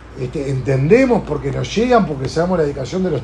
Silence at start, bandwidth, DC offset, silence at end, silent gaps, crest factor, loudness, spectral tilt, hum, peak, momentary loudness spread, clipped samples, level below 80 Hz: 0 s; 10.5 kHz; under 0.1%; 0 s; none; 16 dB; -17 LUFS; -7 dB/octave; none; 0 dBFS; 9 LU; under 0.1%; -36 dBFS